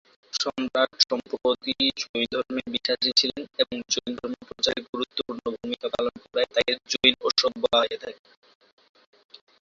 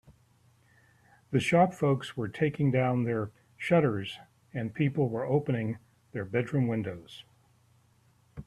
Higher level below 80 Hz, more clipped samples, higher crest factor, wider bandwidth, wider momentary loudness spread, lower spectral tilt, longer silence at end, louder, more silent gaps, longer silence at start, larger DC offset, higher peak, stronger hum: about the same, -62 dBFS vs -64 dBFS; neither; about the same, 24 dB vs 20 dB; second, 7.8 kHz vs 12 kHz; second, 11 LU vs 16 LU; second, -1.5 dB/octave vs -7.5 dB/octave; first, 1.5 s vs 0.05 s; first, -25 LUFS vs -29 LUFS; first, 2.09-2.14 s, 4.89-4.93 s vs none; second, 0.35 s vs 1.3 s; neither; first, -2 dBFS vs -12 dBFS; neither